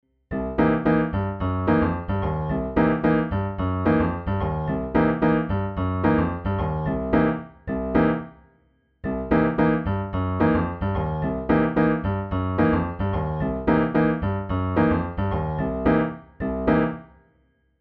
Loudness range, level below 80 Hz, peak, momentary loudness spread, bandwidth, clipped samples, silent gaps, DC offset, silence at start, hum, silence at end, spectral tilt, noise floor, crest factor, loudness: 2 LU; -38 dBFS; -6 dBFS; 6 LU; 5.2 kHz; under 0.1%; none; under 0.1%; 0.3 s; none; 0.75 s; -11 dB/octave; -64 dBFS; 16 dB; -23 LUFS